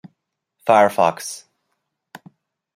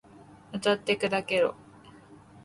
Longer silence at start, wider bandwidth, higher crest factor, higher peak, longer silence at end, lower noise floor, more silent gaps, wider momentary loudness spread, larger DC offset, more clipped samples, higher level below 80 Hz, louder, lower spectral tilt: first, 0.65 s vs 0.15 s; first, 16 kHz vs 11.5 kHz; about the same, 20 dB vs 18 dB; first, -2 dBFS vs -12 dBFS; first, 1.35 s vs 0.3 s; first, -75 dBFS vs -52 dBFS; neither; first, 17 LU vs 4 LU; neither; neither; about the same, -70 dBFS vs -66 dBFS; first, -17 LUFS vs -27 LUFS; about the same, -4 dB/octave vs -4.5 dB/octave